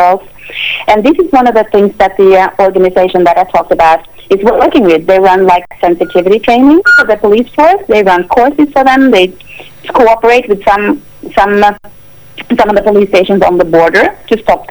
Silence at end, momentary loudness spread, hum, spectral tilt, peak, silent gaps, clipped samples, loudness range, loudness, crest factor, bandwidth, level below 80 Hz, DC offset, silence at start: 0.05 s; 8 LU; none; -6 dB/octave; 0 dBFS; none; 1%; 3 LU; -8 LUFS; 8 dB; over 20 kHz; -36 dBFS; 0.7%; 0 s